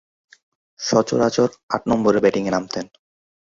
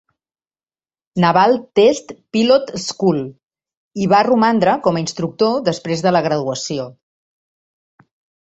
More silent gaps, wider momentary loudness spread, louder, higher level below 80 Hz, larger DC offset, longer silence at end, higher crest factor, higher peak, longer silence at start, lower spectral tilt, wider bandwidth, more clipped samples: second, 1.63-1.69 s vs 3.43-3.47 s, 3.77-3.91 s; about the same, 12 LU vs 12 LU; second, -20 LUFS vs -16 LUFS; about the same, -56 dBFS vs -58 dBFS; neither; second, 0.75 s vs 1.55 s; about the same, 20 dB vs 16 dB; about the same, 0 dBFS vs -2 dBFS; second, 0.8 s vs 1.15 s; about the same, -5 dB/octave vs -5.5 dB/octave; about the same, 7.8 kHz vs 8.2 kHz; neither